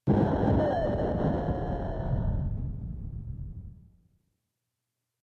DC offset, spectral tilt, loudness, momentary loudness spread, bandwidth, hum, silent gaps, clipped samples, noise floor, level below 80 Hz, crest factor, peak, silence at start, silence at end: under 0.1%; -10.5 dB/octave; -30 LUFS; 15 LU; 6.8 kHz; none; none; under 0.1%; -85 dBFS; -38 dBFS; 16 dB; -12 dBFS; 0.05 s; 1.45 s